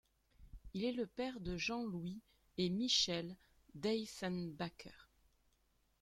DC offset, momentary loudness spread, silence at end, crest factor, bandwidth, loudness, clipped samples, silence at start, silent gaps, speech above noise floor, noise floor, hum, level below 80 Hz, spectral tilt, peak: under 0.1%; 20 LU; 1 s; 22 dB; 14 kHz; -40 LUFS; under 0.1%; 0.4 s; none; 37 dB; -78 dBFS; none; -64 dBFS; -4 dB/octave; -22 dBFS